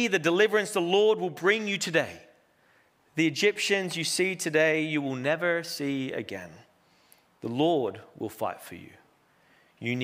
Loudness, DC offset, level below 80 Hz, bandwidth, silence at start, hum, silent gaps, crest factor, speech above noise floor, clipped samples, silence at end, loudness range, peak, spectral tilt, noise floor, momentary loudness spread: -27 LUFS; under 0.1%; -76 dBFS; 16 kHz; 0 s; none; none; 20 dB; 37 dB; under 0.1%; 0 s; 7 LU; -8 dBFS; -4 dB/octave; -64 dBFS; 15 LU